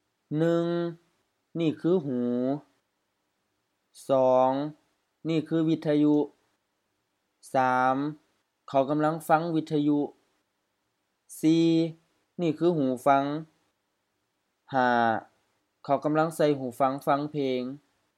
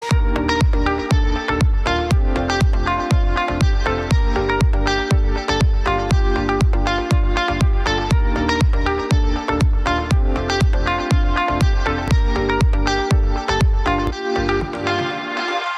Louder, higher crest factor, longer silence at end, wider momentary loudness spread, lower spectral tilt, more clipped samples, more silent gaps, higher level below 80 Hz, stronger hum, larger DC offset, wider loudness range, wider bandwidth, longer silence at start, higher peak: second, -27 LUFS vs -19 LUFS; first, 20 dB vs 12 dB; first, 0.4 s vs 0 s; first, 12 LU vs 3 LU; about the same, -7 dB/octave vs -6 dB/octave; neither; neither; second, -80 dBFS vs -20 dBFS; neither; neither; first, 3 LU vs 0 LU; first, 14.5 kHz vs 12 kHz; first, 0.3 s vs 0 s; about the same, -8 dBFS vs -6 dBFS